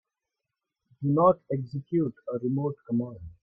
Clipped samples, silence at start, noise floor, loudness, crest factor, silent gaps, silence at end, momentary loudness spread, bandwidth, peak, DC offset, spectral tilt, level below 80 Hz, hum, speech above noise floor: under 0.1%; 1 s; -87 dBFS; -28 LUFS; 20 dB; none; 0.1 s; 10 LU; 5 kHz; -10 dBFS; under 0.1%; -12.5 dB/octave; -62 dBFS; none; 60 dB